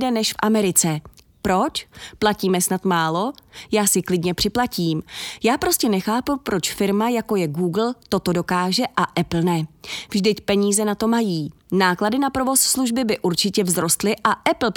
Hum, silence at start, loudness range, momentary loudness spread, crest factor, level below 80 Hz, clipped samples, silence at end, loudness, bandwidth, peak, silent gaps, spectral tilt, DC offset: none; 0 s; 2 LU; 7 LU; 18 dB; -50 dBFS; under 0.1%; 0.05 s; -20 LUFS; 19 kHz; -2 dBFS; none; -4 dB/octave; under 0.1%